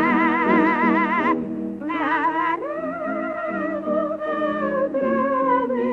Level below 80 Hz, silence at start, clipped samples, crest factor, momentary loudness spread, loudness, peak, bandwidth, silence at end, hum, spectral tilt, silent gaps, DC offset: -60 dBFS; 0 s; under 0.1%; 14 dB; 9 LU; -22 LUFS; -6 dBFS; 6.6 kHz; 0 s; none; -8 dB/octave; none; under 0.1%